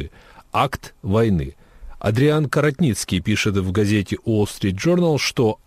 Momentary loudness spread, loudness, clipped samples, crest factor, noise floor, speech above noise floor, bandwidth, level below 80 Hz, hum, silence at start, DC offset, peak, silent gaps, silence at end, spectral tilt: 7 LU; -20 LUFS; under 0.1%; 14 dB; -41 dBFS; 22 dB; 15.5 kHz; -42 dBFS; none; 0 s; under 0.1%; -4 dBFS; none; 0.1 s; -6 dB/octave